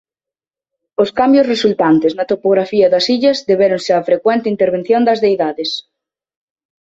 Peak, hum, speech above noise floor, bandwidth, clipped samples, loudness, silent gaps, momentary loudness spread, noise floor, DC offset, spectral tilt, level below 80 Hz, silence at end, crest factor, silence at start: 0 dBFS; none; 76 dB; 8 kHz; under 0.1%; -14 LUFS; none; 6 LU; -89 dBFS; under 0.1%; -5.5 dB/octave; -58 dBFS; 1.05 s; 14 dB; 1 s